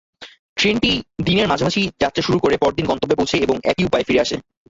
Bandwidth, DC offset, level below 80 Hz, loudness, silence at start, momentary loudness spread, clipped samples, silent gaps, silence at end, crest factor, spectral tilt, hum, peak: 8 kHz; under 0.1%; -42 dBFS; -18 LUFS; 0.2 s; 4 LU; under 0.1%; 0.39-0.56 s; 0.3 s; 16 dB; -5 dB/octave; none; -4 dBFS